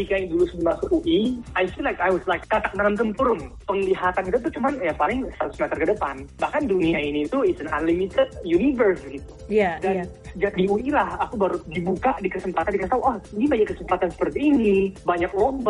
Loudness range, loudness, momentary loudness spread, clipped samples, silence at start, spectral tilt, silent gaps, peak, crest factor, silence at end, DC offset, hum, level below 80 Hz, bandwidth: 2 LU; -23 LUFS; 6 LU; under 0.1%; 0 s; -7 dB/octave; none; -8 dBFS; 14 dB; 0 s; under 0.1%; none; -42 dBFS; 11 kHz